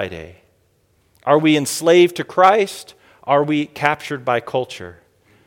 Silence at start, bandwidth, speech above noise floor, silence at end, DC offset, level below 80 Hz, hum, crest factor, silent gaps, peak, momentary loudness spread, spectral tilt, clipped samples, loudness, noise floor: 0 s; 17 kHz; 43 dB; 0.55 s; under 0.1%; -58 dBFS; none; 18 dB; none; 0 dBFS; 20 LU; -4.5 dB/octave; under 0.1%; -17 LUFS; -60 dBFS